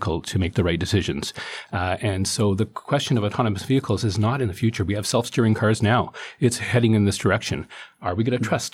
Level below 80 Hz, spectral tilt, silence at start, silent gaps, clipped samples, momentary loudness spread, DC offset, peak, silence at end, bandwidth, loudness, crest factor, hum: -46 dBFS; -5.5 dB/octave; 0 s; none; under 0.1%; 9 LU; under 0.1%; -6 dBFS; 0.05 s; 15 kHz; -23 LUFS; 16 dB; none